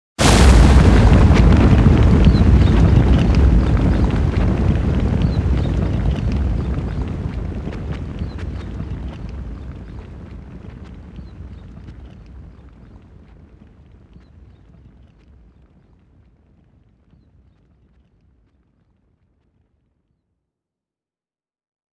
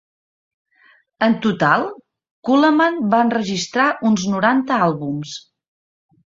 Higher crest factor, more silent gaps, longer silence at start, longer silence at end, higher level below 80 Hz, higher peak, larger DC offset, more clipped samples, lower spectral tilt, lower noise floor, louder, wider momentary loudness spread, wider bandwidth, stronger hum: about the same, 18 dB vs 18 dB; second, none vs 2.31-2.42 s; second, 0.2 s vs 1.2 s; first, 9.55 s vs 0.95 s; first, -20 dBFS vs -62 dBFS; about the same, 0 dBFS vs 0 dBFS; neither; neither; first, -6.5 dB/octave vs -5 dB/octave; first, under -90 dBFS vs -55 dBFS; about the same, -16 LUFS vs -17 LUFS; first, 25 LU vs 12 LU; first, 11 kHz vs 7.8 kHz; neither